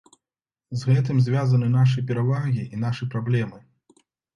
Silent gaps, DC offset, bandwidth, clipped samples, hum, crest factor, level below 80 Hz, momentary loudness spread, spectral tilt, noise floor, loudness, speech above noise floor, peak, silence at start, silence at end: none; under 0.1%; 7.2 kHz; under 0.1%; none; 14 dB; -58 dBFS; 8 LU; -8 dB/octave; under -90 dBFS; -23 LUFS; over 69 dB; -8 dBFS; 0.7 s; 0.75 s